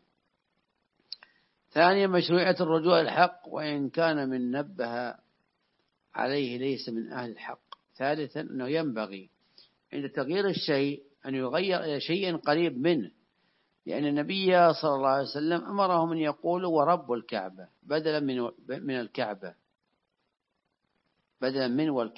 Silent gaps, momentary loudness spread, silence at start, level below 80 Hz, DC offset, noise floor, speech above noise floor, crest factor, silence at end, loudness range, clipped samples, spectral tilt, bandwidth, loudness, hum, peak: none; 15 LU; 1.75 s; -82 dBFS; under 0.1%; -80 dBFS; 52 dB; 22 dB; 0.05 s; 8 LU; under 0.1%; -9.5 dB/octave; 5.8 kHz; -28 LUFS; none; -6 dBFS